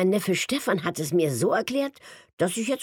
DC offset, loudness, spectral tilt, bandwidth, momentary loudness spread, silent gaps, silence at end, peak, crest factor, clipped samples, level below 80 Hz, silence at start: under 0.1%; -25 LUFS; -4.5 dB/octave; 19 kHz; 5 LU; 2.33-2.37 s; 0 s; -10 dBFS; 14 dB; under 0.1%; -68 dBFS; 0 s